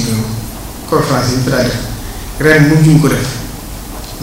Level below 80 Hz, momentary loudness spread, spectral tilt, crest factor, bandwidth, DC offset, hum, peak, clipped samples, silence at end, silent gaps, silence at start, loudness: -28 dBFS; 18 LU; -5.5 dB/octave; 12 dB; 16.5 kHz; under 0.1%; none; 0 dBFS; 0.2%; 0 s; none; 0 s; -12 LUFS